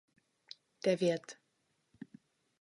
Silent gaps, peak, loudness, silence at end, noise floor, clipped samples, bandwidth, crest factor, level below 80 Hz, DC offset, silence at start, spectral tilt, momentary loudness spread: none; -18 dBFS; -34 LUFS; 1.3 s; -79 dBFS; under 0.1%; 11.5 kHz; 22 dB; -84 dBFS; under 0.1%; 0.85 s; -5.5 dB/octave; 23 LU